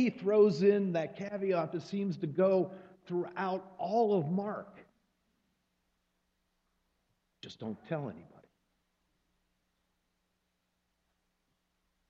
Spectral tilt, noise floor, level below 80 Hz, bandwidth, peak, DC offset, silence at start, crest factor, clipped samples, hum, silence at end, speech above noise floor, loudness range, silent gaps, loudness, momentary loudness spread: -8 dB/octave; -81 dBFS; -78 dBFS; 7.4 kHz; -14 dBFS; under 0.1%; 0 s; 20 dB; under 0.1%; none; 3.85 s; 49 dB; 16 LU; none; -32 LUFS; 17 LU